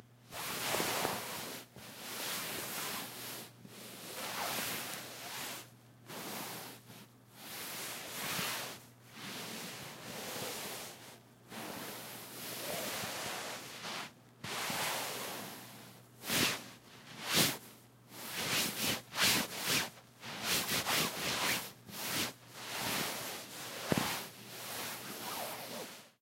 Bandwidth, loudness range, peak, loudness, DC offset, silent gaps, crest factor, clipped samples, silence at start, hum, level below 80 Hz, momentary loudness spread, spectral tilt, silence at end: 16 kHz; 9 LU; -12 dBFS; -37 LUFS; under 0.1%; none; 28 dB; under 0.1%; 0 s; none; -72 dBFS; 17 LU; -1.5 dB/octave; 0.1 s